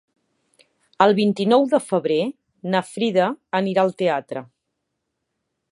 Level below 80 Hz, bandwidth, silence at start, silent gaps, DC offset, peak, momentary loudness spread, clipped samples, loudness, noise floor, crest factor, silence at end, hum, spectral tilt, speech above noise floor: -74 dBFS; 11.5 kHz; 1 s; none; under 0.1%; -2 dBFS; 11 LU; under 0.1%; -20 LUFS; -78 dBFS; 20 dB; 1.3 s; none; -6 dB/octave; 58 dB